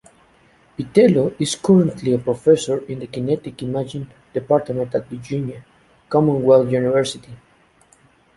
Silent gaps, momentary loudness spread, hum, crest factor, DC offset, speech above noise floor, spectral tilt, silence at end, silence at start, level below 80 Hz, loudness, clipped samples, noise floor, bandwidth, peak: none; 15 LU; none; 18 dB; under 0.1%; 37 dB; -6.5 dB/octave; 1 s; 0.8 s; -54 dBFS; -19 LUFS; under 0.1%; -55 dBFS; 11.5 kHz; -2 dBFS